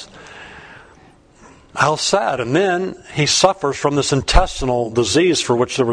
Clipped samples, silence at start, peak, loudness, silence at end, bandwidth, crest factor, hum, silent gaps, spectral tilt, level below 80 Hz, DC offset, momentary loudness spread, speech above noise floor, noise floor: under 0.1%; 0 s; 0 dBFS; -17 LUFS; 0 s; 10.5 kHz; 18 dB; none; none; -4 dB/octave; -28 dBFS; under 0.1%; 19 LU; 31 dB; -48 dBFS